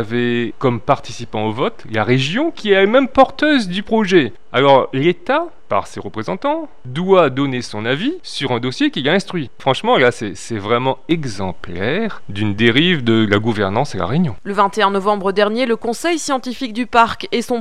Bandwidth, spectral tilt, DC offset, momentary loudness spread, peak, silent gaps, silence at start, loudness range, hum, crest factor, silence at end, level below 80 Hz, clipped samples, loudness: 13 kHz; -5.5 dB/octave; 2%; 10 LU; 0 dBFS; none; 0 s; 4 LU; none; 16 dB; 0 s; -48 dBFS; under 0.1%; -17 LUFS